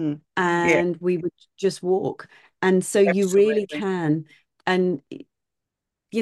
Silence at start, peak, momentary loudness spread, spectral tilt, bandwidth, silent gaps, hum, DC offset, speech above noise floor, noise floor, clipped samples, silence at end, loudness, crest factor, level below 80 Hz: 0 s; -6 dBFS; 12 LU; -5.5 dB/octave; 12.5 kHz; none; none; under 0.1%; 62 dB; -84 dBFS; under 0.1%; 0 s; -22 LUFS; 18 dB; -66 dBFS